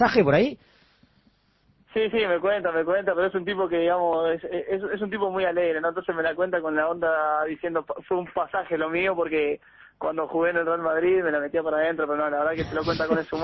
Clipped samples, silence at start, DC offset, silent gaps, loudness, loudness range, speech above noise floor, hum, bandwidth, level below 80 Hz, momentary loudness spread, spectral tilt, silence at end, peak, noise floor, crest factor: under 0.1%; 0 s; under 0.1%; none; -25 LUFS; 2 LU; 40 dB; none; 6 kHz; -56 dBFS; 6 LU; -7 dB/octave; 0 s; -6 dBFS; -64 dBFS; 18 dB